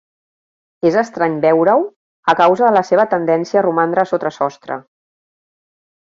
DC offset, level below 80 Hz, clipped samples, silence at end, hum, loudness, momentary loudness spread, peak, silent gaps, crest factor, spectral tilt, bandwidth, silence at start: under 0.1%; -64 dBFS; under 0.1%; 1.25 s; none; -15 LUFS; 10 LU; -2 dBFS; 1.96-2.23 s; 14 dB; -6.5 dB/octave; 7.6 kHz; 0.85 s